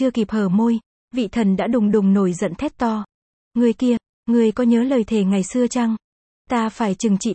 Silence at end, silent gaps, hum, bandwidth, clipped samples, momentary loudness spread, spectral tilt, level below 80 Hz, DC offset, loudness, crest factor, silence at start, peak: 0 s; 0.86-1.08 s, 3.14-3.51 s, 4.09-4.23 s, 6.04-6.45 s; none; 8.8 kHz; under 0.1%; 8 LU; -6.5 dB/octave; -52 dBFS; under 0.1%; -20 LUFS; 14 dB; 0 s; -6 dBFS